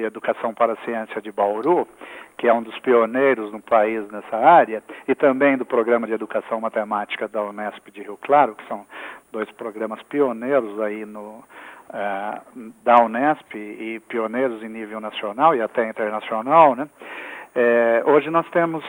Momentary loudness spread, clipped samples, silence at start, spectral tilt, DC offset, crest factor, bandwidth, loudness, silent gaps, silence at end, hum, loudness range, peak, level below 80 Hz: 18 LU; under 0.1%; 0 s; -6.5 dB/octave; under 0.1%; 20 dB; 16.5 kHz; -20 LUFS; none; 0 s; none; 6 LU; 0 dBFS; -70 dBFS